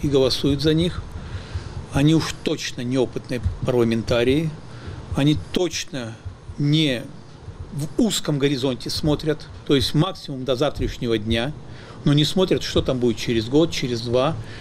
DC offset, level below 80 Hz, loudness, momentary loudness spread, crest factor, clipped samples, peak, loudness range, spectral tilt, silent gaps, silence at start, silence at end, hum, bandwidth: under 0.1%; -38 dBFS; -22 LUFS; 15 LU; 14 dB; under 0.1%; -8 dBFS; 2 LU; -5.5 dB/octave; none; 0 s; 0 s; none; 15 kHz